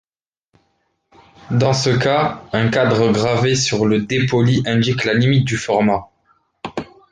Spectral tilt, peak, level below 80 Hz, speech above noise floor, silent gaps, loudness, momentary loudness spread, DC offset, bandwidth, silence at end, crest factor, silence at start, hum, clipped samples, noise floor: -5.5 dB/octave; -4 dBFS; -48 dBFS; 59 dB; none; -16 LUFS; 8 LU; under 0.1%; 9.6 kHz; 0.25 s; 14 dB; 1.5 s; none; under 0.1%; -75 dBFS